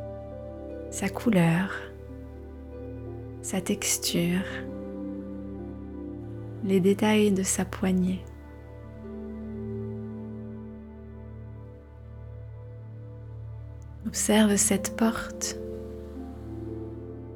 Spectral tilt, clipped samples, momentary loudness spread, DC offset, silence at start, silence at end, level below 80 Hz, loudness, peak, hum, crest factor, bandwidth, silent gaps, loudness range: -4.5 dB/octave; under 0.1%; 21 LU; under 0.1%; 0 s; 0 s; -46 dBFS; -28 LUFS; -10 dBFS; none; 20 dB; 18.5 kHz; none; 13 LU